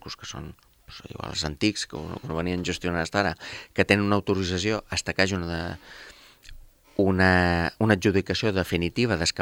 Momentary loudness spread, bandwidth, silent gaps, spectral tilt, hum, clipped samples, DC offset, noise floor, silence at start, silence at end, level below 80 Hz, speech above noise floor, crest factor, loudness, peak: 17 LU; 16.5 kHz; none; -5 dB/octave; none; under 0.1%; under 0.1%; -46 dBFS; 0.05 s; 0 s; -50 dBFS; 21 dB; 24 dB; -25 LUFS; -2 dBFS